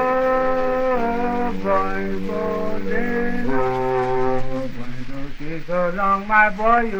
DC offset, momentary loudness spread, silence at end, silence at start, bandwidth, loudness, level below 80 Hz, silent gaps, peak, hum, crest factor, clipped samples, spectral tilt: under 0.1%; 15 LU; 0 s; 0 s; 6.8 kHz; -21 LUFS; -32 dBFS; none; -2 dBFS; none; 16 dB; under 0.1%; -7 dB/octave